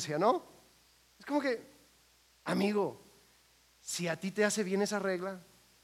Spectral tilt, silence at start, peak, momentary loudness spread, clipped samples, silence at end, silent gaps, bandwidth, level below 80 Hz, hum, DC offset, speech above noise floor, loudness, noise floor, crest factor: -4.5 dB/octave; 0 s; -14 dBFS; 13 LU; under 0.1%; 0.4 s; none; 16 kHz; -76 dBFS; none; under 0.1%; 34 dB; -34 LUFS; -66 dBFS; 20 dB